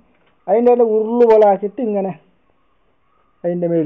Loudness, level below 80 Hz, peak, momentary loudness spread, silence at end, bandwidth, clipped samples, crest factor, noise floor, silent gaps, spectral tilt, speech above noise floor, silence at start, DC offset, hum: -15 LUFS; -62 dBFS; -4 dBFS; 15 LU; 0 s; 4.8 kHz; under 0.1%; 12 dB; -62 dBFS; none; -10 dB/octave; 48 dB; 0.45 s; 0.1%; none